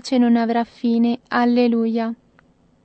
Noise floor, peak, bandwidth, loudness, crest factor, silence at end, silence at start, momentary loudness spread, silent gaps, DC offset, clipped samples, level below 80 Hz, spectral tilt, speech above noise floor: -56 dBFS; -4 dBFS; 8.4 kHz; -19 LUFS; 14 dB; 0.7 s; 0.05 s; 8 LU; none; under 0.1%; under 0.1%; -64 dBFS; -6 dB/octave; 38 dB